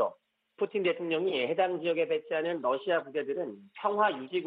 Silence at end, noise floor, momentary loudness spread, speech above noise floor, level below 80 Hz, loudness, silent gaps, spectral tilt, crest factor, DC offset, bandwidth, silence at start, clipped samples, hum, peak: 0 s; -58 dBFS; 6 LU; 28 dB; -82 dBFS; -31 LUFS; none; -8 dB/octave; 18 dB; under 0.1%; 4.9 kHz; 0 s; under 0.1%; none; -12 dBFS